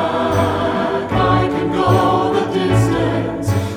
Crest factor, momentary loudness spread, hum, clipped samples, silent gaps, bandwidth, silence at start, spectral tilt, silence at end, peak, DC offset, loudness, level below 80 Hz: 14 dB; 5 LU; none; under 0.1%; none; 14.5 kHz; 0 s; -6.5 dB/octave; 0 s; -2 dBFS; under 0.1%; -16 LUFS; -36 dBFS